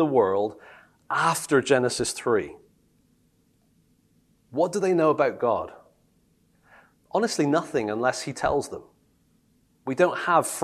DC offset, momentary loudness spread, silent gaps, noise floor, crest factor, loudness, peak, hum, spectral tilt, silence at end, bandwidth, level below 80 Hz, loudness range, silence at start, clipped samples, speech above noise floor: under 0.1%; 11 LU; none; -65 dBFS; 20 dB; -24 LUFS; -6 dBFS; none; -4.5 dB/octave; 0 s; 13 kHz; -58 dBFS; 2 LU; 0 s; under 0.1%; 41 dB